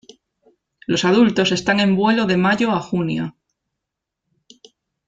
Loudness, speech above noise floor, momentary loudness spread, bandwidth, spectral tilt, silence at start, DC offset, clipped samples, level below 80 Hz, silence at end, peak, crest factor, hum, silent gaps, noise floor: -17 LUFS; 65 dB; 10 LU; 7.8 kHz; -5.5 dB/octave; 0.9 s; under 0.1%; under 0.1%; -56 dBFS; 1.8 s; -2 dBFS; 18 dB; none; none; -82 dBFS